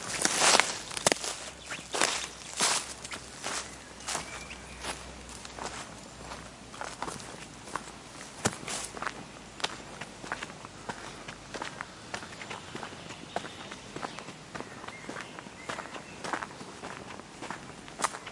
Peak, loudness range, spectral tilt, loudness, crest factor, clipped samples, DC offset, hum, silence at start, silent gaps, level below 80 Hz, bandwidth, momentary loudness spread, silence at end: -2 dBFS; 10 LU; -1.5 dB/octave; -34 LUFS; 34 dB; under 0.1%; under 0.1%; none; 0 s; none; -60 dBFS; 11.5 kHz; 16 LU; 0 s